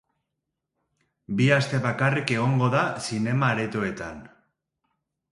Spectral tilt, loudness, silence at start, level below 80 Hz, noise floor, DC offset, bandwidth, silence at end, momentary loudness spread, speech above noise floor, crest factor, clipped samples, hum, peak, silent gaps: -6 dB/octave; -24 LUFS; 1.3 s; -60 dBFS; -82 dBFS; under 0.1%; 11.5 kHz; 1.05 s; 11 LU; 59 dB; 22 dB; under 0.1%; none; -4 dBFS; none